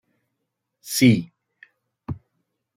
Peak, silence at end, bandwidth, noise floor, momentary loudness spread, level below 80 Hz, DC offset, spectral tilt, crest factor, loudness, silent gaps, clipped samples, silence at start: -4 dBFS; 0.6 s; 16 kHz; -79 dBFS; 24 LU; -58 dBFS; under 0.1%; -5 dB/octave; 22 dB; -19 LUFS; none; under 0.1%; 0.85 s